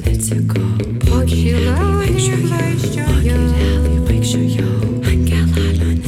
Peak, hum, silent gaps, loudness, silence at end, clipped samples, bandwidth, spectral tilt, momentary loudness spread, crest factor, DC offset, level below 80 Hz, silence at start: -2 dBFS; none; none; -16 LUFS; 0 s; under 0.1%; 15 kHz; -6 dB/octave; 3 LU; 12 dB; under 0.1%; -20 dBFS; 0 s